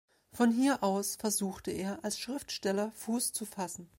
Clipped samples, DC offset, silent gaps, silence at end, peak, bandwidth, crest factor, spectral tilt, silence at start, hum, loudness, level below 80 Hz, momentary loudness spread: under 0.1%; under 0.1%; none; 0.15 s; -16 dBFS; 16.5 kHz; 18 dB; -3.5 dB/octave; 0.35 s; none; -33 LUFS; -68 dBFS; 9 LU